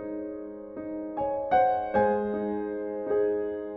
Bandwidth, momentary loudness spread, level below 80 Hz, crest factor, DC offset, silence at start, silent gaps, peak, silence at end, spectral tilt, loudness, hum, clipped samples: 5.4 kHz; 13 LU; -56 dBFS; 16 dB; under 0.1%; 0 s; none; -12 dBFS; 0 s; -9.5 dB/octave; -28 LUFS; none; under 0.1%